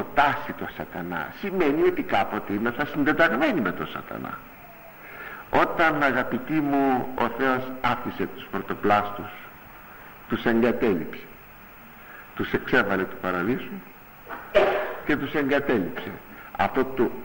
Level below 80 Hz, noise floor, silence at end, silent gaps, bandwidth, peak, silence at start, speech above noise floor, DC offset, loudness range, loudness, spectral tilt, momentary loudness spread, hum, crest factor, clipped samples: -50 dBFS; -46 dBFS; 0 s; none; 16.5 kHz; -6 dBFS; 0 s; 22 dB; under 0.1%; 4 LU; -25 LUFS; -6.5 dB/octave; 21 LU; none; 18 dB; under 0.1%